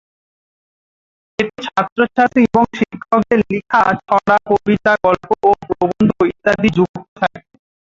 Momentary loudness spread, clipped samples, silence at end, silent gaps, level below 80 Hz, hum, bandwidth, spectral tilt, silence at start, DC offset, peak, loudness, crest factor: 8 LU; under 0.1%; 0.5 s; 1.92-1.96 s, 6.89-6.94 s, 7.08-7.16 s; -48 dBFS; none; 7.6 kHz; -7 dB/octave; 1.4 s; under 0.1%; -2 dBFS; -15 LUFS; 14 dB